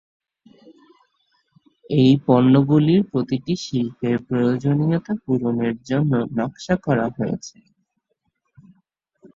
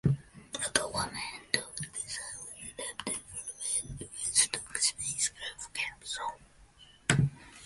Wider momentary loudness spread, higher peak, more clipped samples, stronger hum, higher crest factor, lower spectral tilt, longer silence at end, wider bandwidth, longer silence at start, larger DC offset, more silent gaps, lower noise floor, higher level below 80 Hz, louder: about the same, 10 LU vs 12 LU; about the same, -2 dBFS vs -4 dBFS; neither; neither; second, 18 dB vs 30 dB; first, -7.5 dB/octave vs -2.5 dB/octave; first, 1.85 s vs 0 s; second, 7.6 kHz vs 12 kHz; first, 1.9 s vs 0.05 s; neither; neither; first, -73 dBFS vs -58 dBFS; about the same, -56 dBFS vs -58 dBFS; first, -20 LUFS vs -33 LUFS